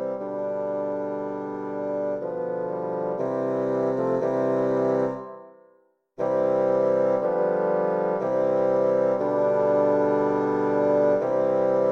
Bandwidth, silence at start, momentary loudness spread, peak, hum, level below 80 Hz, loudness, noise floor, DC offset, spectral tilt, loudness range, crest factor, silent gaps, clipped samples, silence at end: 6.6 kHz; 0 s; 8 LU; -10 dBFS; none; -68 dBFS; -24 LUFS; -62 dBFS; under 0.1%; -9 dB/octave; 6 LU; 14 dB; none; under 0.1%; 0 s